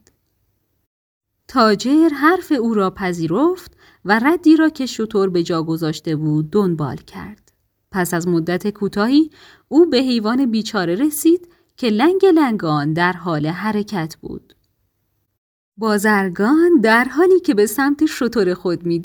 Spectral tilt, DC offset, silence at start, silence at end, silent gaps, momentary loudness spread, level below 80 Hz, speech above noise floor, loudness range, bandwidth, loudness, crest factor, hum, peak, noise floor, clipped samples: -5.5 dB/octave; under 0.1%; 1.5 s; 0 s; 15.38-15.72 s; 11 LU; -54 dBFS; 52 dB; 5 LU; over 20 kHz; -17 LUFS; 16 dB; none; -2 dBFS; -69 dBFS; under 0.1%